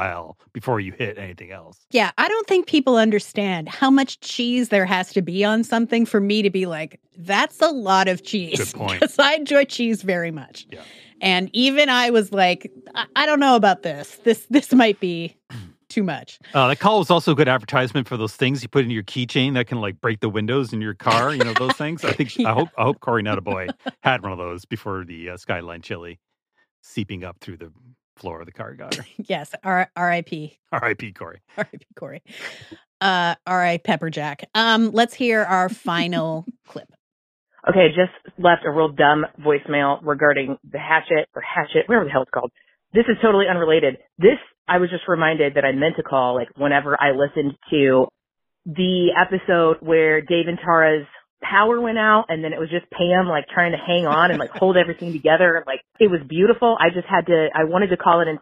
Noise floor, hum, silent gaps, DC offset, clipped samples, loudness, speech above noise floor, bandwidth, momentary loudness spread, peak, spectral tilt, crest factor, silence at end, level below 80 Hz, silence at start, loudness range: -69 dBFS; none; 26.71-26.83 s, 28.04-28.17 s, 30.59-30.63 s, 32.87-33.00 s, 36.99-37.46 s, 44.58-44.65 s, 51.30-51.37 s; under 0.1%; under 0.1%; -19 LUFS; 49 dB; 15 kHz; 15 LU; -2 dBFS; -5.5 dB/octave; 18 dB; 0.05 s; -60 dBFS; 0 s; 8 LU